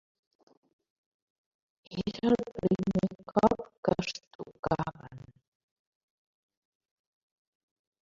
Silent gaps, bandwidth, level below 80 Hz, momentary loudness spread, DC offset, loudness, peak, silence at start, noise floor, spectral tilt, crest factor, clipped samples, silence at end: 3.77-3.83 s, 4.27-4.39 s, 4.59-4.63 s; 7.6 kHz; -60 dBFS; 15 LU; under 0.1%; -31 LUFS; -8 dBFS; 1.9 s; -50 dBFS; -7 dB/octave; 26 dB; under 0.1%; 2.8 s